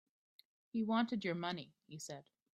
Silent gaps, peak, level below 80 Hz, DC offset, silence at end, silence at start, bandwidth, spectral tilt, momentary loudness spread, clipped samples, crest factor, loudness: none; -22 dBFS; -82 dBFS; under 0.1%; 0.3 s; 0.75 s; 12.5 kHz; -5 dB/octave; 16 LU; under 0.1%; 18 dB; -40 LUFS